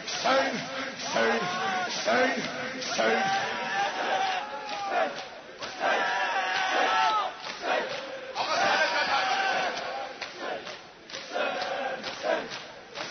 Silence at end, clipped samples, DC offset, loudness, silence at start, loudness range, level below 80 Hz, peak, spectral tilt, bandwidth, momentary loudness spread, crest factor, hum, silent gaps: 0 s; under 0.1%; under 0.1%; -28 LUFS; 0 s; 4 LU; -70 dBFS; -12 dBFS; -2 dB/octave; 6.6 kHz; 12 LU; 18 dB; none; none